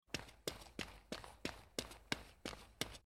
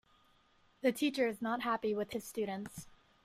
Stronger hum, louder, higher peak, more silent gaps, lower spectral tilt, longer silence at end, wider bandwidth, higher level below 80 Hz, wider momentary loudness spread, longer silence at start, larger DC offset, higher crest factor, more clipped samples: neither; second, -48 LUFS vs -36 LUFS; about the same, -20 dBFS vs -18 dBFS; neither; second, -3 dB/octave vs -4.5 dB/octave; second, 0.05 s vs 0.35 s; about the same, 16.5 kHz vs 16 kHz; first, -64 dBFS vs -72 dBFS; second, 6 LU vs 10 LU; second, 0.1 s vs 0.85 s; neither; first, 30 dB vs 18 dB; neither